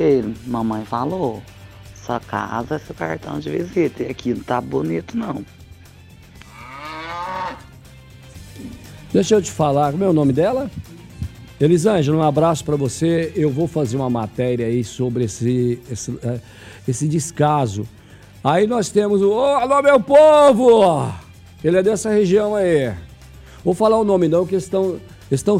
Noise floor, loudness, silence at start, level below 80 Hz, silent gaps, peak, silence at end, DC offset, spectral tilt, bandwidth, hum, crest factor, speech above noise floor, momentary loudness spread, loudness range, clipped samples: -43 dBFS; -18 LUFS; 0 s; -46 dBFS; none; -2 dBFS; 0 s; under 0.1%; -6.5 dB/octave; 15.5 kHz; none; 16 dB; 26 dB; 17 LU; 12 LU; under 0.1%